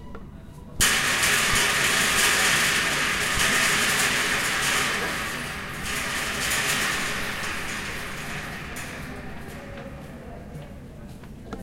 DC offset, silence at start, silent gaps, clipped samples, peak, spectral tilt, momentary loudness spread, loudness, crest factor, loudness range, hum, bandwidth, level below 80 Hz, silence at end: under 0.1%; 0 s; none; under 0.1%; -8 dBFS; -1 dB/octave; 21 LU; -22 LUFS; 18 dB; 15 LU; none; 16 kHz; -44 dBFS; 0 s